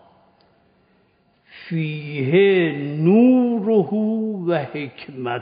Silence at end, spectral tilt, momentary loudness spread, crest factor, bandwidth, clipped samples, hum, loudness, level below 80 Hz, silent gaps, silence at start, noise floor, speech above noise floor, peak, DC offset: 0 s; -6.5 dB/octave; 14 LU; 16 dB; 5 kHz; under 0.1%; none; -19 LUFS; -70 dBFS; none; 1.55 s; -61 dBFS; 42 dB; -4 dBFS; under 0.1%